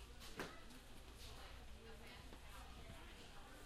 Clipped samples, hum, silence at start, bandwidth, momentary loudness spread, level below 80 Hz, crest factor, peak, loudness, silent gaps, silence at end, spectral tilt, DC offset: under 0.1%; none; 0 s; 15.5 kHz; 7 LU; -60 dBFS; 22 dB; -34 dBFS; -57 LUFS; none; 0 s; -3.5 dB/octave; under 0.1%